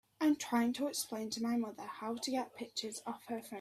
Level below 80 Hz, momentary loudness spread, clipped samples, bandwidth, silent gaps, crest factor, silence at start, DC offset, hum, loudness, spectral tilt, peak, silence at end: -78 dBFS; 10 LU; under 0.1%; 15.5 kHz; none; 16 dB; 0.2 s; under 0.1%; none; -38 LUFS; -3 dB/octave; -20 dBFS; 0 s